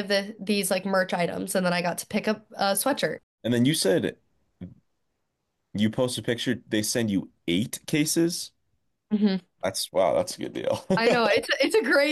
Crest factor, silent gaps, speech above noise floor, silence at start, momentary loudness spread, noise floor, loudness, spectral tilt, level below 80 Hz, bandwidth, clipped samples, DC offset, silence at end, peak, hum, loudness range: 14 dB; 3.23-3.38 s; 54 dB; 0 s; 9 LU; -79 dBFS; -25 LUFS; -4 dB/octave; -66 dBFS; 13 kHz; under 0.1%; under 0.1%; 0 s; -12 dBFS; none; 3 LU